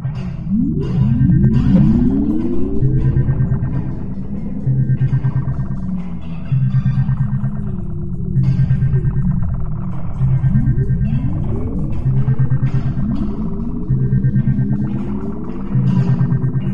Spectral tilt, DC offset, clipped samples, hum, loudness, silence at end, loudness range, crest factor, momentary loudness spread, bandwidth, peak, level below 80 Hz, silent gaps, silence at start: -11 dB/octave; 6%; under 0.1%; none; -18 LUFS; 0 s; 4 LU; 14 dB; 10 LU; 3.5 kHz; -2 dBFS; -26 dBFS; none; 0 s